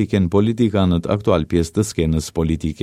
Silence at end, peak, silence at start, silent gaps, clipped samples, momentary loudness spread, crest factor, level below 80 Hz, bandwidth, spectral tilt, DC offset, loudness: 0 s; -2 dBFS; 0 s; none; under 0.1%; 4 LU; 16 dB; -34 dBFS; 15 kHz; -7 dB/octave; under 0.1%; -19 LUFS